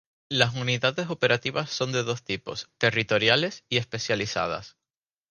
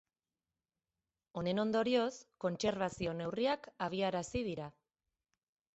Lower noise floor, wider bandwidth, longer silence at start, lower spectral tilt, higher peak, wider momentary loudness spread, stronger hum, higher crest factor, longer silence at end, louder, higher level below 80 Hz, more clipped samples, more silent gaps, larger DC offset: about the same, under -90 dBFS vs under -90 dBFS; first, 11 kHz vs 8.2 kHz; second, 0.3 s vs 1.35 s; second, -4 dB/octave vs -5.5 dB/octave; first, -4 dBFS vs -20 dBFS; about the same, 9 LU vs 8 LU; neither; first, 24 dB vs 18 dB; second, 0.6 s vs 1.05 s; first, -25 LUFS vs -37 LUFS; about the same, -60 dBFS vs -64 dBFS; neither; neither; neither